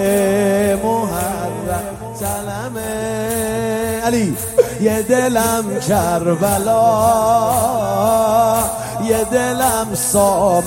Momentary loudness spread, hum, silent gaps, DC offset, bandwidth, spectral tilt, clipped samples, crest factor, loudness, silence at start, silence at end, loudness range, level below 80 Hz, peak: 9 LU; none; none; under 0.1%; 16.5 kHz; -4.5 dB/octave; under 0.1%; 16 dB; -16 LUFS; 0 s; 0 s; 6 LU; -40 dBFS; 0 dBFS